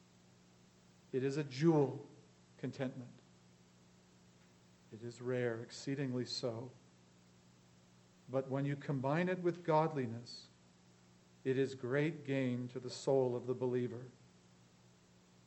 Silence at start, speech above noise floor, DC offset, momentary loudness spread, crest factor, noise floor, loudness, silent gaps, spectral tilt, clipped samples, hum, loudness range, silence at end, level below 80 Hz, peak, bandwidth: 1.15 s; 29 dB; under 0.1%; 17 LU; 20 dB; -66 dBFS; -38 LUFS; none; -6.5 dB/octave; under 0.1%; 60 Hz at -70 dBFS; 7 LU; 1.35 s; -82 dBFS; -20 dBFS; 8.4 kHz